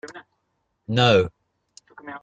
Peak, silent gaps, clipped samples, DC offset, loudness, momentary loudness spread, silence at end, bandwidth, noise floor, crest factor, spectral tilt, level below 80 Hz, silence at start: -4 dBFS; none; under 0.1%; under 0.1%; -20 LUFS; 24 LU; 0.05 s; 9 kHz; -74 dBFS; 20 dB; -5.5 dB/octave; -56 dBFS; 0.05 s